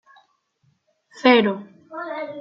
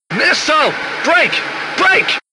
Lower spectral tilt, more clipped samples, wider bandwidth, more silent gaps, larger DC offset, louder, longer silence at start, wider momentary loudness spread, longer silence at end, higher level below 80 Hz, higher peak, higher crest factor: first, -6 dB/octave vs -2 dB/octave; neither; second, 7.6 kHz vs 11 kHz; neither; neither; second, -19 LUFS vs -13 LUFS; first, 1.15 s vs 0.1 s; first, 18 LU vs 7 LU; second, 0 s vs 0.15 s; second, -74 dBFS vs -60 dBFS; about the same, -2 dBFS vs 0 dBFS; first, 20 dB vs 14 dB